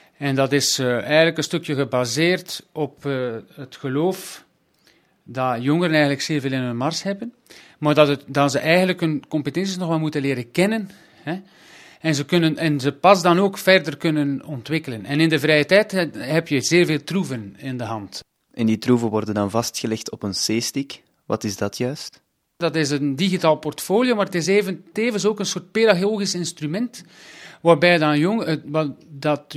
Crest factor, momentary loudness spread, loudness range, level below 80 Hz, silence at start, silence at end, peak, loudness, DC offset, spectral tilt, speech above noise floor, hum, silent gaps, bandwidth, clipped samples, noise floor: 20 dB; 14 LU; 5 LU; -64 dBFS; 0.2 s; 0 s; 0 dBFS; -20 LUFS; under 0.1%; -5 dB/octave; 39 dB; none; none; 15.5 kHz; under 0.1%; -60 dBFS